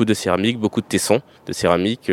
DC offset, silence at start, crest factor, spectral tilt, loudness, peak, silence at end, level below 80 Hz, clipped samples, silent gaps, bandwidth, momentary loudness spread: under 0.1%; 0 s; 18 dB; -4.5 dB/octave; -19 LUFS; 0 dBFS; 0 s; -52 dBFS; under 0.1%; none; 17 kHz; 4 LU